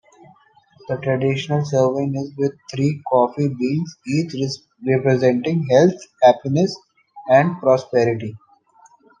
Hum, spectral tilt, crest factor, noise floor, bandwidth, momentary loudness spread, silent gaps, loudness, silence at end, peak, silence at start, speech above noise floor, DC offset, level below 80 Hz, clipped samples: none; -7 dB/octave; 18 dB; -53 dBFS; 9.2 kHz; 10 LU; none; -19 LUFS; 0.85 s; -2 dBFS; 0.9 s; 35 dB; under 0.1%; -62 dBFS; under 0.1%